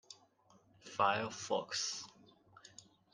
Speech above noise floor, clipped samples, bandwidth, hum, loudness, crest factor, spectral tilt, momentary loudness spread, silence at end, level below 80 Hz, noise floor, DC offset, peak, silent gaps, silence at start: 32 dB; under 0.1%; 11 kHz; none; -37 LUFS; 24 dB; -2 dB/octave; 24 LU; 0.35 s; -84 dBFS; -69 dBFS; under 0.1%; -16 dBFS; none; 0.1 s